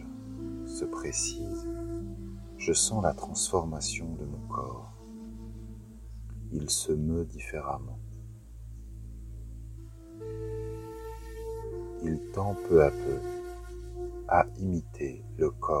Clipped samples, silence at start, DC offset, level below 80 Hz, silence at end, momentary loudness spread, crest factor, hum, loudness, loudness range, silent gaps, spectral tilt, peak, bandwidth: under 0.1%; 0 s; under 0.1%; -44 dBFS; 0 s; 19 LU; 26 dB; none; -32 LUFS; 12 LU; none; -4.5 dB/octave; -8 dBFS; 16 kHz